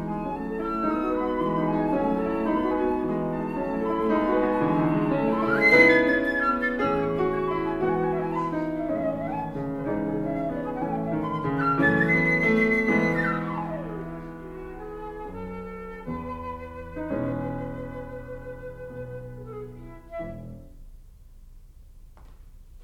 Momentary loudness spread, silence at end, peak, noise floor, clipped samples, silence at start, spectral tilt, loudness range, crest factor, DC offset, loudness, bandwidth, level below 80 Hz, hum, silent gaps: 18 LU; 0 s; -6 dBFS; -47 dBFS; under 0.1%; 0 s; -7.5 dB/octave; 18 LU; 20 dB; under 0.1%; -25 LUFS; 13 kHz; -46 dBFS; none; none